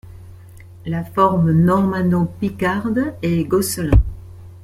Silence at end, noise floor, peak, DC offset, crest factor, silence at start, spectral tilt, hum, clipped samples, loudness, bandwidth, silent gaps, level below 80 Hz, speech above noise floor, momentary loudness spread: 0 s; -40 dBFS; -2 dBFS; under 0.1%; 16 dB; 0.05 s; -7 dB/octave; none; under 0.1%; -18 LUFS; 15 kHz; none; -28 dBFS; 23 dB; 11 LU